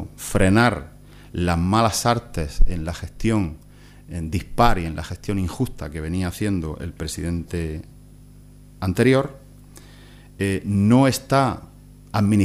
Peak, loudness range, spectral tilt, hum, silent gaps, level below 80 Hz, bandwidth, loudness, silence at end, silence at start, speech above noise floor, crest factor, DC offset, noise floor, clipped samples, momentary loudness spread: -2 dBFS; 6 LU; -6 dB/octave; 50 Hz at -45 dBFS; none; -32 dBFS; 15.5 kHz; -22 LUFS; 0 s; 0 s; 25 dB; 20 dB; under 0.1%; -45 dBFS; under 0.1%; 14 LU